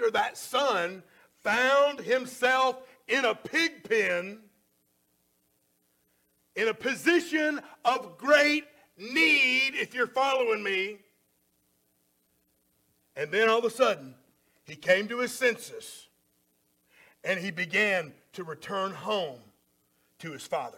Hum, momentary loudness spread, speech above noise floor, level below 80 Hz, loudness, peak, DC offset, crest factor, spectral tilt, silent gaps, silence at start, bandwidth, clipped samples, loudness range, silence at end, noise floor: none; 18 LU; 44 dB; -76 dBFS; -27 LUFS; -8 dBFS; under 0.1%; 20 dB; -3 dB/octave; none; 0 s; 17 kHz; under 0.1%; 7 LU; 0.1 s; -72 dBFS